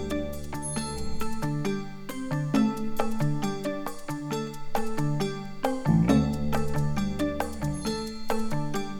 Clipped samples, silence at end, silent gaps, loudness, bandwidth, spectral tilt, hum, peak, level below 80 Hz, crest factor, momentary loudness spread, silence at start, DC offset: under 0.1%; 0 s; none; -29 LUFS; 18 kHz; -6 dB/octave; none; -8 dBFS; -40 dBFS; 18 dB; 10 LU; 0 s; under 0.1%